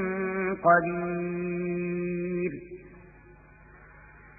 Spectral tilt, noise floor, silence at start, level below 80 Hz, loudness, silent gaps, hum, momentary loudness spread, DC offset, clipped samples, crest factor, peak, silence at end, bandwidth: -14 dB/octave; -53 dBFS; 0 s; -58 dBFS; -28 LUFS; none; none; 14 LU; under 0.1%; under 0.1%; 22 dB; -8 dBFS; 0 s; 2.7 kHz